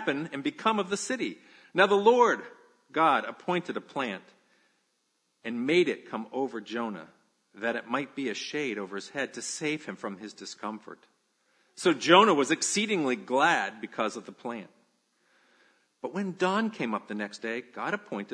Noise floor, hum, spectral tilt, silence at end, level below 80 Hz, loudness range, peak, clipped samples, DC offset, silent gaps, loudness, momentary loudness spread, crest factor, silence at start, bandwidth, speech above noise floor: -75 dBFS; none; -3.5 dB/octave; 0 s; -84 dBFS; 9 LU; -4 dBFS; under 0.1%; under 0.1%; none; -28 LUFS; 16 LU; 26 dB; 0 s; 10.5 kHz; 47 dB